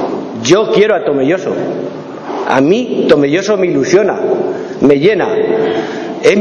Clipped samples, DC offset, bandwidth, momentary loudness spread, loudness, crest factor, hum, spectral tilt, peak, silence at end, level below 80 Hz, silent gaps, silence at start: 0.6%; under 0.1%; 9.2 kHz; 10 LU; -12 LUFS; 12 dB; none; -5.5 dB/octave; 0 dBFS; 0 s; -50 dBFS; none; 0 s